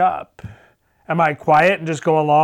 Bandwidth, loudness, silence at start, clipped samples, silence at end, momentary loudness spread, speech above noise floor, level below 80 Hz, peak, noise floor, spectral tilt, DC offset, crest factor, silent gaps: 11.5 kHz; -17 LUFS; 0 s; under 0.1%; 0 s; 13 LU; 39 dB; -54 dBFS; -4 dBFS; -55 dBFS; -6 dB/octave; under 0.1%; 14 dB; none